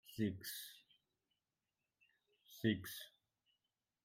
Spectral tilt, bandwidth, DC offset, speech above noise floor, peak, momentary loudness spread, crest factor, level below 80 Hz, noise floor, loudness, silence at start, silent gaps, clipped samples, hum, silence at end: -5 dB/octave; 16 kHz; under 0.1%; over 48 dB; -24 dBFS; 20 LU; 24 dB; -80 dBFS; under -90 dBFS; -44 LUFS; 0.05 s; none; under 0.1%; none; 0.95 s